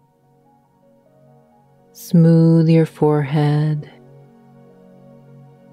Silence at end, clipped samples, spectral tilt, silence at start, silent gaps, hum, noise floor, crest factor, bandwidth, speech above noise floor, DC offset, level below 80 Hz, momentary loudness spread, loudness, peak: 1.85 s; under 0.1%; -9 dB/octave; 2 s; none; none; -56 dBFS; 16 dB; 13.5 kHz; 42 dB; under 0.1%; -64 dBFS; 10 LU; -15 LUFS; -4 dBFS